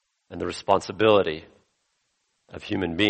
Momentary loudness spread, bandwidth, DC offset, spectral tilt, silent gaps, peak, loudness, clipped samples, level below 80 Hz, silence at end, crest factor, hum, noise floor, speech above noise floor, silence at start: 21 LU; 8.4 kHz; under 0.1%; -5 dB/octave; none; -4 dBFS; -24 LUFS; under 0.1%; -56 dBFS; 0 s; 20 dB; none; -74 dBFS; 50 dB; 0.3 s